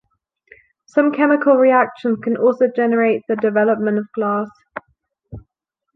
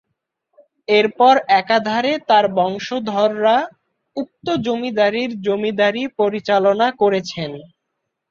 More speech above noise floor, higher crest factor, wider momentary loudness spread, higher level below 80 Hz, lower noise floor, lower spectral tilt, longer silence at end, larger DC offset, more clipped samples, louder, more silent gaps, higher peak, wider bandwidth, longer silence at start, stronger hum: about the same, 61 dB vs 59 dB; about the same, 16 dB vs 16 dB; second, 10 LU vs 14 LU; first, -56 dBFS vs -62 dBFS; about the same, -77 dBFS vs -76 dBFS; first, -8.5 dB/octave vs -5 dB/octave; about the same, 0.55 s vs 0.65 s; neither; neither; about the same, -17 LUFS vs -17 LUFS; neither; about the same, -2 dBFS vs -2 dBFS; second, 6.2 kHz vs 7.4 kHz; about the same, 0.95 s vs 0.9 s; neither